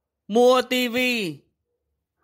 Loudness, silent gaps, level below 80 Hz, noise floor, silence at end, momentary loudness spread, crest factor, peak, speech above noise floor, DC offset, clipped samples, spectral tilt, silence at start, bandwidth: -20 LUFS; none; -68 dBFS; -78 dBFS; 0.9 s; 9 LU; 16 dB; -8 dBFS; 58 dB; under 0.1%; under 0.1%; -3.5 dB/octave; 0.3 s; 16 kHz